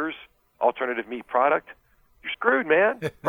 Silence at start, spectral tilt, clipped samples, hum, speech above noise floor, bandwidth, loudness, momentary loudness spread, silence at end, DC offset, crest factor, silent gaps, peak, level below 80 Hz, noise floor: 0 s; -6 dB/octave; under 0.1%; none; 22 dB; 13.5 kHz; -24 LUFS; 13 LU; 0 s; under 0.1%; 18 dB; none; -6 dBFS; -64 dBFS; -46 dBFS